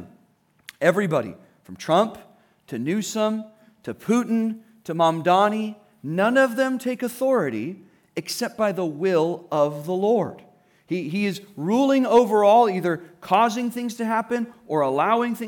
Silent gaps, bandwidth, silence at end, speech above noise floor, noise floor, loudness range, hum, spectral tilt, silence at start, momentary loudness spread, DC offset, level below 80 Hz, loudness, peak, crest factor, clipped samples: none; 18.5 kHz; 0 s; 40 dB; -62 dBFS; 5 LU; none; -5.5 dB/octave; 0 s; 14 LU; under 0.1%; -74 dBFS; -22 LUFS; -6 dBFS; 16 dB; under 0.1%